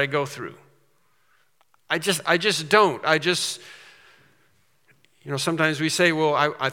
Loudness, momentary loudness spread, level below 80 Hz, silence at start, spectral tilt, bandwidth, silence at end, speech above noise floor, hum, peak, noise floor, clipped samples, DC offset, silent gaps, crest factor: -22 LUFS; 14 LU; -78 dBFS; 0 s; -3.5 dB/octave; 18 kHz; 0 s; 44 dB; none; 0 dBFS; -66 dBFS; under 0.1%; under 0.1%; none; 24 dB